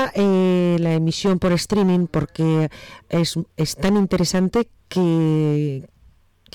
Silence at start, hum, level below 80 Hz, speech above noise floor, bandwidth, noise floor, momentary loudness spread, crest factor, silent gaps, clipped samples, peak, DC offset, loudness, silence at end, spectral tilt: 0 s; none; -44 dBFS; 34 dB; 15 kHz; -54 dBFS; 7 LU; 8 dB; none; under 0.1%; -12 dBFS; under 0.1%; -20 LUFS; 0.7 s; -6.5 dB/octave